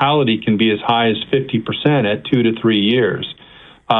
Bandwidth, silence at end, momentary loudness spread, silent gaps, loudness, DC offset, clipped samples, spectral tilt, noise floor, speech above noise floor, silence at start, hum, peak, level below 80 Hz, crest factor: 4.2 kHz; 0 s; 6 LU; none; -16 LUFS; under 0.1%; under 0.1%; -9 dB/octave; -43 dBFS; 28 dB; 0 s; none; 0 dBFS; -54 dBFS; 16 dB